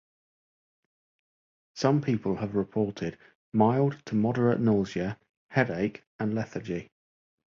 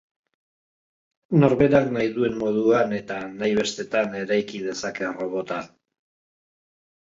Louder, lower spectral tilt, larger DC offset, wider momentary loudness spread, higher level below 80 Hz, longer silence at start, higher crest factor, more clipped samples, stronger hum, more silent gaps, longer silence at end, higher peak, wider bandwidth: second, -28 LUFS vs -23 LUFS; first, -7.5 dB/octave vs -6 dB/octave; neither; about the same, 12 LU vs 11 LU; about the same, -60 dBFS vs -56 dBFS; first, 1.75 s vs 1.3 s; about the same, 20 dB vs 20 dB; neither; neither; first, 3.35-3.52 s, 5.29-5.49 s, 6.07-6.19 s vs none; second, 0.75 s vs 1.45 s; second, -8 dBFS vs -4 dBFS; about the same, 7.4 kHz vs 7.8 kHz